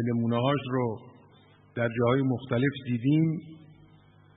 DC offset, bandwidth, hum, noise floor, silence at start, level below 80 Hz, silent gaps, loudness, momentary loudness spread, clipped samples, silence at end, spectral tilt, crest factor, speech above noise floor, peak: under 0.1%; 4 kHz; 50 Hz at -55 dBFS; -57 dBFS; 0 s; -64 dBFS; none; -28 LUFS; 12 LU; under 0.1%; 0.8 s; -11.5 dB/octave; 16 dB; 30 dB; -12 dBFS